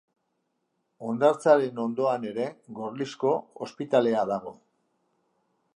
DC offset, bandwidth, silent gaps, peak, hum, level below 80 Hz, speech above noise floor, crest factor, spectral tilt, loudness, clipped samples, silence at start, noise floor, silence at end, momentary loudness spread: under 0.1%; 11 kHz; none; -8 dBFS; none; -78 dBFS; 51 dB; 20 dB; -6 dB/octave; -26 LUFS; under 0.1%; 1 s; -77 dBFS; 1.25 s; 15 LU